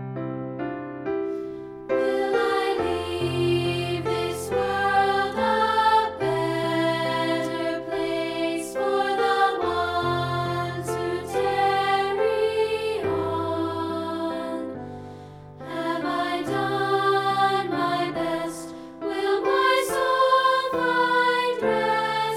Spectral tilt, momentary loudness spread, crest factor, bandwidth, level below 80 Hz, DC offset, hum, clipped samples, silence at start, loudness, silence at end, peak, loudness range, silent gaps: -5 dB/octave; 11 LU; 16 dB; 16.5 kHz; -56 dBFS; under 0.1%; none; under 0.1%; 0 s; -24 LUFS; 0 s; -8 dBFS; 5 LU; none